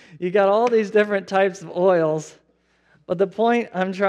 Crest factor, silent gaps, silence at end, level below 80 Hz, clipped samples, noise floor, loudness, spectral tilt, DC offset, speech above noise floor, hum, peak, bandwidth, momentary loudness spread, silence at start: 16 dB; none; 0 s; -72 dBFS; under 0.1%; -62 dBFS; -20 LUFS; -6 dB/octave; under 0.1%; 43 dB; none; -4 dBFS; 9.8 kHz; 8 LU; 0.15 s